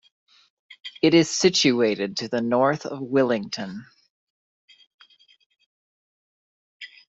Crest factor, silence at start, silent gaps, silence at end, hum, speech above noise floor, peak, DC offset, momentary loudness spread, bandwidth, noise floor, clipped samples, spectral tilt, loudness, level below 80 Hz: 20 dB; 0.85 s; 4.10-4.68 s, 4.87-4.98 s, 5.46-5.50 s, 5.66-6.80 s; 0.2 s; none; over 69 dB; -4 dBFS; under 0.1%; 22 LU; 8.2 kHz; under -90 dBFS; under 0.1%; -4 dB/octave; -22 LUFS; -66 dBFS